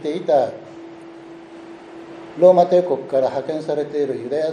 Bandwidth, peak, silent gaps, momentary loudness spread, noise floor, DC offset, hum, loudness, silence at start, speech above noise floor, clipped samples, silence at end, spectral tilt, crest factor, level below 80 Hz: 9.6 kHz; 0 dBFS; none; 25 LU; -39 dBFS; under 0.1%; none; -18 LUFS; 0 s; 21 dB; under 0.1%; 0 s; -7 dB/octave; 20 dB; -70 dBFS